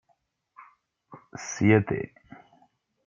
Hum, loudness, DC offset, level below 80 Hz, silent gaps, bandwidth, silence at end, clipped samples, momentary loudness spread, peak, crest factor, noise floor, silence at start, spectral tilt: none; -25 LUFS; under 0.1%; -62 dBFS; none; 7.4 kHz; 1 s; under 0.1%; 19 LU; -6 dBFS; 24 dB; -72 dBFS; 0.6 s; -6.5 dB/octave